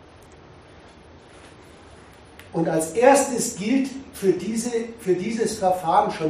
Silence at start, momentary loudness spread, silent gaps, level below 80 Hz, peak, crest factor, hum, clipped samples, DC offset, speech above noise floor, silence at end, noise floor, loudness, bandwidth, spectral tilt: 0.3 s; 10 LU; none; -58 dBFS; -2 dBFS; 22 dB; none; under 0.1%; under 0.1%; 26 dB; 0 s; -47 dBFS; -22 LUFS; 14 kHz; -4.5 dB/octave